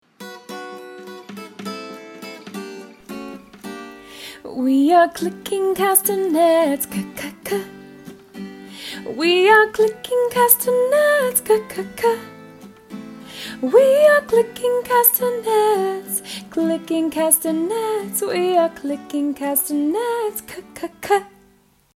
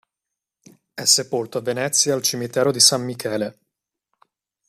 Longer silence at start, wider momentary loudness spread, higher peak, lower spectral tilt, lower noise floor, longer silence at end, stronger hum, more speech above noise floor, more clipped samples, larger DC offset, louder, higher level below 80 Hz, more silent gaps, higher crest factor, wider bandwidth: second, 0.2 s vs 0.95 s; first, 22 LU vs 12 LU; about the same, 0 dBFS vs 0 dBFS; about the same, -3 dB/octave vs -2 dB/octave; second, -56 dBFS vs -85 dBFS; second, 0.65 s vs 1.2 s; neither; second, 38 dB vs 64 dB; neither; neither; about the same, -18 LUFS vs -19 LUFS; first, -60 dBFS vs -68 dBFS; neither; about the same, 20 dB vs 22 dB; about the same, 16.5 kHz vs 15 kHz